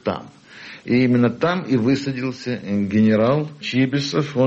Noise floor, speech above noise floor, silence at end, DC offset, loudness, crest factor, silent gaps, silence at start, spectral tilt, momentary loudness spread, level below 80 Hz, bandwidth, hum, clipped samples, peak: -41 dBFS; 22 dB; 0 s; under 0.1%; -20 LUFS; 12 dB; none; 0.05 s; -7 dB/octave; 12 LU; -58 dBFS; 8 kHz; none; under 0.1%; -8 dBFS